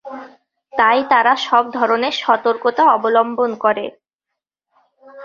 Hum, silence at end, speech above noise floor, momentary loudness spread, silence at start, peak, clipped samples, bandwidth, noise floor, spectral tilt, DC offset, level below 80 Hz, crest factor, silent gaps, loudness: none; 0 s; 66 dB; 11 LU; 0.05 s; -2 dBFS; under 0.1%; 7.4 kHz; -81 dBFS; -3.5 dB/octave; under 0.1%; -66 dBFS; 16 dB; 4.15-4.19 s; -16 LUFS